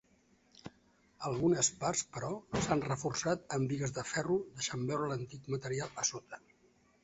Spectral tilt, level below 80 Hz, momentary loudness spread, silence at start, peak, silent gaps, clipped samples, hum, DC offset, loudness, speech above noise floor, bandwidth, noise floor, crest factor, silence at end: -5 dB/octave; -62 dBFS; 18 LU; 0.65 s; -16 dBFS; none; under 0.1%; none; under 0.1%; -35 LUFS; 34 dB; 8 kHz; -69 dBFS; 20 dB; 0.65 s